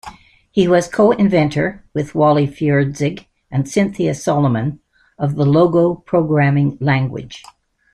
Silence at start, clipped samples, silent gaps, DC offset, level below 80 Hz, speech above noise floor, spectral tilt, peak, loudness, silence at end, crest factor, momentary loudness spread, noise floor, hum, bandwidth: 0.05 s; under 0.1%; none; under 0.1%; -48 dBFS; 24 dB; -7 dB/octave; -2 dBFS; -16 LUFS; 0.55 s; 14 dB; 11 LU; -39 dBFS; none; 11 kHz